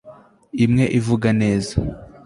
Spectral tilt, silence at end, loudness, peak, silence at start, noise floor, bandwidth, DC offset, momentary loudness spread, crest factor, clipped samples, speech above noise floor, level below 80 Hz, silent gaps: -7 dB/octave; 0.2 s; -19 LUFS; -4 dBFS; 0.05 s; -45 dBFS; 11.5 kHz; under 0.1%; 10 LU; 16 dB; under 0.1%; 28 dB; -38 dBFS; none